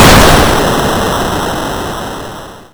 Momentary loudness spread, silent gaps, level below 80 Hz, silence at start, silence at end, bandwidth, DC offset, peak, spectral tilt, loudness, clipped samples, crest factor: 18 LU; none; -20 dBFS; 0 s; 0.1 s; over 20 kHz; under 0.1%; 0 dBFS; -4 dB/octave; -10 LUFS; 3%; 10 dB